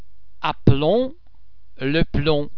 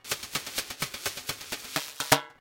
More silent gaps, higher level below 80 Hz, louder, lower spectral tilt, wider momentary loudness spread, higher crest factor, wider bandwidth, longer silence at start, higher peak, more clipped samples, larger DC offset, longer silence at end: neither; first, -34 dBFS vs -60 dBFS; first, -21 LUFS vs -31 LUFS; first, -9 dB/octave vs -1.5 dB/octave; about the same, 10 LU vs 9 LU; second, 22 dB vs 32 dB; second, 5.4 kHz vs 17 kHz; first, 0.2 s vs 0.05 s; about the same, 0 dBFS vs 0 dBFS; neither; first, 3% vs under 0.1%; about the same, 0 s vs 0.05 s